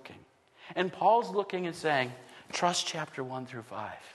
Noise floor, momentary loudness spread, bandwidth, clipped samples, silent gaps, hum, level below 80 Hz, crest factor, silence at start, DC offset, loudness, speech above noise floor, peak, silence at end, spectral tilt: -58 dBFS; 15 LU; 12.5 kHz; under 0.1%; none; none; -76 dBFS; 20 dB; 0.05 s; under 0.1%; -31 LUFS; 27 dB; -12 dBFS; 0 s; -3.5 dB/octave